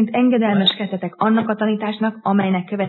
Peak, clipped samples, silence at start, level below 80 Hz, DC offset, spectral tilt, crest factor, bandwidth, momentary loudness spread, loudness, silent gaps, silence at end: -2 dBFS; under 0.1%; 0 s; -72 dBFS; under 0.1%; -8.5 dB/octave; 16 dB; 4.3 kHz; 6 LU; -18 LUFS; none; 0 s